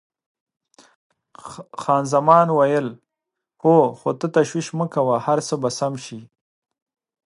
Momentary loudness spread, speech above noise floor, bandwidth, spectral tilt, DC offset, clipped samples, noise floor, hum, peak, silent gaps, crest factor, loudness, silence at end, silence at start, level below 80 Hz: 19 LU; 64 dB; 11.5 kHz; -6 dB/octave; under 0.1%; under 0.1%; -83 dBFS; none; 0 dBFS; none; 20 dB; -19 LUFS; 1.05 s; 1.45 s; -70 dBFS